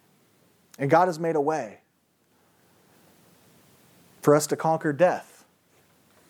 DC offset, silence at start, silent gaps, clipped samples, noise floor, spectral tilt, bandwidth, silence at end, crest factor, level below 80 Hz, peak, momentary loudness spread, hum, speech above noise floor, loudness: under 0.1%; 0.8 s; none; under 0.1%; -68 dBFS; -5.5 dB/octave; 19.5 kHz; 1.05 s; 22 dB; -80 dBFS; -6 dBFS; 11 LU; none; 45 dB; -24 LUFS